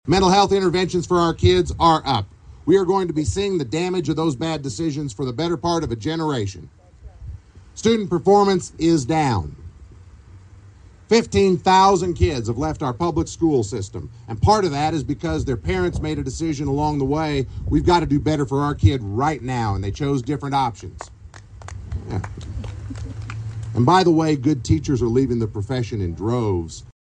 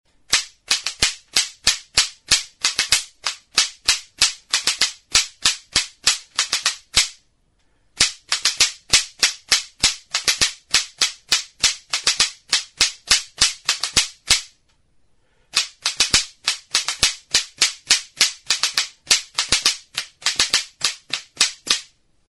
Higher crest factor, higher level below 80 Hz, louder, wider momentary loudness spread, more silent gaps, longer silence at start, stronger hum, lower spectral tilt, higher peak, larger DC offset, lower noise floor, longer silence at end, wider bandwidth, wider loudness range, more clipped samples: about the same, 18 dB vs 22 dB; first, -36 dBFS vs -46 dBFS; about the same, -20 LUFS vs -19 LUFS; first, 16 LU vs 5 LU; neither; second, 0.05 s vs 0.3 s; neither; first, -6 dB/octave vs 1.5 dB/octave; second, -4 dBFS vs 0 dBFS; neither; second, -45 dBFS vs -62 dBFS; second, 0.1 s vs 0.45 s; second, 10 kHz vs over 20 kHz; first, 6 LU vs 2 LU; neither